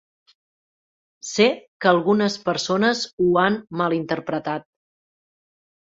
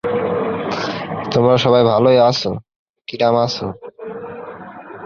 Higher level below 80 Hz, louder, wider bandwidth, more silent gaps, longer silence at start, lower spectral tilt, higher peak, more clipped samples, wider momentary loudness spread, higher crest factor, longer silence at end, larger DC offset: second, -64 dBFS vs -52 dBFS; second, -21 LUFS vs -16 LUFS; first, 8 kHz vs 7.2 kHz; about the same, 1.68-1.80 s, 3.13-3.18 s vs 2.76-2.94 s; first, 1.25 s vs 0.05 s; second, -4.5 dB/octave vs -6 dB/octave; about the same, -2 dBFS vs -2 dBFS; neither; second, 9 LU vs 20 LU; about the same, 20 dB vs 16 dB; first, 1.35 s vs 0 s; neither